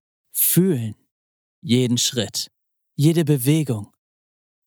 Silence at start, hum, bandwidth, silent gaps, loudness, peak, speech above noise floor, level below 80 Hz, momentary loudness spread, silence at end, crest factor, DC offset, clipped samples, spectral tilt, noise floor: 0.35 s; none; over 20 kHz; 1.11-1.62 s; -20 LUFS; -4 dBFS; over 71 dB; -76 dBFS; 15 LU; 0.8 s; 18 dB; under 0.1%; under 0.1%; -5 dB/octave; under -90 dBFS